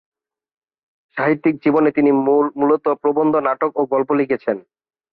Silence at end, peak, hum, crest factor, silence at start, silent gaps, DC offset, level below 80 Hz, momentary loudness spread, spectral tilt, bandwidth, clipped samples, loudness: 0.5 s; -4 dBFS; none; 14 dB; 1.15 s; none; under 0.1%; -64 dBFS; 7 LU; -10.5 dB/octave; 4.8 kHz; under 0.1%; -17 LUFS